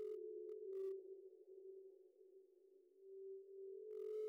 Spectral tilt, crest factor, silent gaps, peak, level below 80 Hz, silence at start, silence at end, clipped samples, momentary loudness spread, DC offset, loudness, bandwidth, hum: -5 dB/octave; 12 dB; none; -40 dBFS; under -90 dBFS; 0 s; 0 s; under 0.1%; 19 LU; under 0.1%; -53 LUFS; 5.6 kHz; none